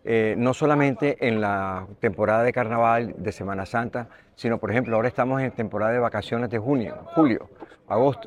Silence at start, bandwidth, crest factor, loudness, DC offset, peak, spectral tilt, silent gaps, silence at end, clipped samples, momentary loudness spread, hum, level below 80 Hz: 0.05 s; 11 kHz; 18 dB; -24 LUFS; under 0.1%; -6 dBFS; -7.5 dB/octave; none; 0 s; under 0.1%; 10 LU; none; -56 dBFS